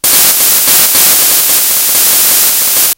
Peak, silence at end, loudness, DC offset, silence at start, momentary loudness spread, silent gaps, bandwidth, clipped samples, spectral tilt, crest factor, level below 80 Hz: 0 dBFS; 0.05 s; -4 LUFS; 0.2%; 0.05 s; 2 LU; none; over 20 kHz; 2%; 1.5 dB/octave; 8 dB; -48 dBFS